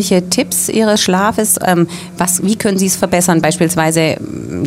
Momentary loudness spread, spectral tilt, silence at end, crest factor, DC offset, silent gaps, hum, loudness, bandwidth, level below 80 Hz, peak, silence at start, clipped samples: 5 LU; -4 dB/octave; 0 s; 14 dB; under 0.1%; none; none; -13 LUFS; 16.5 kHz; -46 dBFS; 0 dBFS; 0 s; under 0.1%